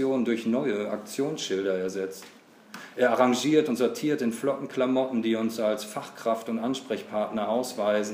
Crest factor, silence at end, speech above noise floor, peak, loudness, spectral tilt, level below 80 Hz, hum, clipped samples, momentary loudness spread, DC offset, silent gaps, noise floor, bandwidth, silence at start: 20 dB; 0 s; 20 dB; -8 dBFS; -27 LUFS; -4.5 dB/octave; -78 dBFS; none; under 0.1%; 9 LU; under 0.1%; none; -46 dBFS; 15.5 kHz; 0 s